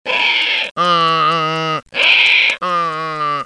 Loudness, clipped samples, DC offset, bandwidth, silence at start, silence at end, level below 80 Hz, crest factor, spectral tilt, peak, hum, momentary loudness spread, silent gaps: -13 LUFS; under 0.1%; under 0.1%; 10.5 kHz; 0.05 s; 0 s; -60 dBFS; 14 dB; -3 dB/octave; 0 dBFS; none; 10 LU; 0.71-0.75 s